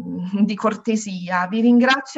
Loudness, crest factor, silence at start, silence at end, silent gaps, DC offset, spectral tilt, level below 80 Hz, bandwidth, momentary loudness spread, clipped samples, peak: -19 LUFS; 16 dB; 0 s; 0 s; none; under 0.1%; -5 dB/octave; -66 dBFS; 8 kHz; 9 LU; under 0.1%; -4 dBFS